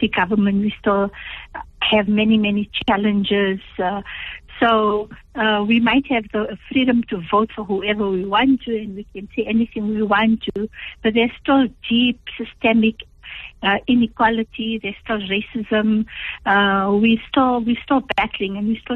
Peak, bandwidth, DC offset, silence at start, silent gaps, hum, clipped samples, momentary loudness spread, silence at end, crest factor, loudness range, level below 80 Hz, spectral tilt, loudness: -4 dBFS; 4.2 kHz; under 0.1%; 0 s; none; none; under 0.1%; 11 LU; 0 s; 14 dB; 2 LU; -46 dBFS; -8 dB/octave; -19 LUFS